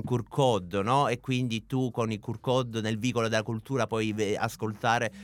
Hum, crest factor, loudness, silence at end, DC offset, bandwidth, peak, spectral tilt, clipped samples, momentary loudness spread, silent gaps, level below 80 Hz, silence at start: none; 18 dB; -29 LUFS; 0 s; under 0.1%; 17 kHz; -10 dBFS; -5.5 dB/octave; under 0.1%; 5 LU; none; -60 dBFS; 0 s